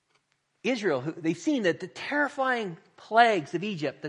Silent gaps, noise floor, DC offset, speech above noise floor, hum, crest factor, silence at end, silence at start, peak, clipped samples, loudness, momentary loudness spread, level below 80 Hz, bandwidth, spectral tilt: none; -72 dBFS; under 0.1%; 45 dB; none; 22 dB; 0 s; 0.65 s; -6 dBFS; under 0.1%; -27 LUFS; 12 LU; -80 dBFS; 10.5 kHz; -5 dB/octave